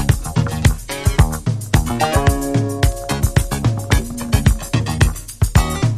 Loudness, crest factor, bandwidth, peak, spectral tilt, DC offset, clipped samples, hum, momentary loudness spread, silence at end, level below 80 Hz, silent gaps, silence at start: -18 LUFS; 16 dB; 15.5 kHz; 0 dBFS; -5.5 dB/octave; under 0.1%; under 0.1%; none; 4 LU; 0 s; -22 dBFS; none; 0 s